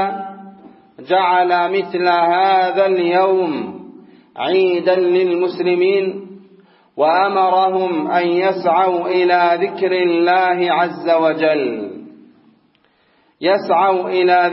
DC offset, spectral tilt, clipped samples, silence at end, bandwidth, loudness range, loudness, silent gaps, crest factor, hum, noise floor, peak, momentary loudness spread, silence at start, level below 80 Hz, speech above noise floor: under 0.1%; -10 dB/octave; under 0.1%; 0 s; 5.8 kHz; 3 LU; -16 LUFS; none; 14 dB; none; -58 dBFS; -2 dBFS; 9 LU; 0 s; -76 dBFS; 43 dB